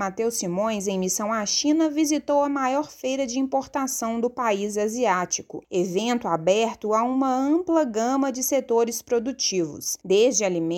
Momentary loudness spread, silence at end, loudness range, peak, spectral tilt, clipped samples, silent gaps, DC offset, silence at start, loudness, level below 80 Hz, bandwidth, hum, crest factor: 5 LU; 0 s; 2 LU; -8 dBFS; -3.5 dB/octave; under 0.1%; none; under 0.1%; 0 s; -24 LUFS; -62 dBFS; 17 kHz; none; 16 dB